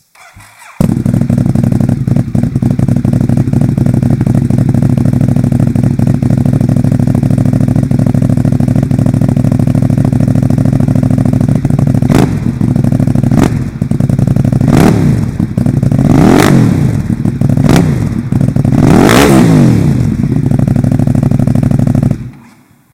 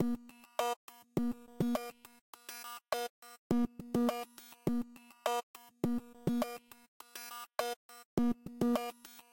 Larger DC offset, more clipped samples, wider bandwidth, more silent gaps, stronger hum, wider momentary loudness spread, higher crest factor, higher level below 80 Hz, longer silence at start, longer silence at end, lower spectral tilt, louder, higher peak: first, 0.4% vs under 0.1%; first, 3% vs under 0.1%; about the same, 16 kHz vs 17 kHz; second, none vs 0.76-0.88 s, 2.21-2.33 s, 3.10-3.22 s, 3.38-3.50 s, 5.43-5.54 s, 6.88-7.00 s, 7.76-7.89 s, 8.05-8.17 s; neither; second, 6 LU vs 15 LU; second, 8 dB vs 20 dB; first, -26 dBFS vs -62 dBFS; first, 0.35 s vs 0 s; first, 0.6 s vs 0.1 s; first, -7.5 dB/octave vs -5.5 dB/octave; first, -9 LUFS vs -38 LUFS; first, 0 dBFS vs -18 dBFS